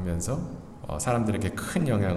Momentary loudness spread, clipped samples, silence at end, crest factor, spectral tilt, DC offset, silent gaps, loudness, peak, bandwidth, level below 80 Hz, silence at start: 12 LU; under 0.1%; 0 s; 16 dB; -6 dB/octave; under 0.1%; none; -29 LUFS; -12 dBFS; 14.5 kHz; -46 dBFS; 0 s